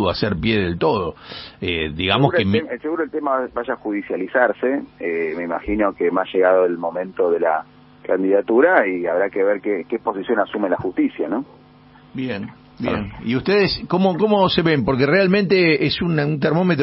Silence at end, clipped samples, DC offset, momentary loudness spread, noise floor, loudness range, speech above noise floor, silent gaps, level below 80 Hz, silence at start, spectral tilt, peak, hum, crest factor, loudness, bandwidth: 0 s; under 0.1%; under 0.1%; 10 LU; -47 dBFS; 6 LU; 28 dB; none; -46 dBFS; 0 s; -4.5 dB/octave; 0 dBFS; none; 20 dB; -19 LUFS; 5.8 kHz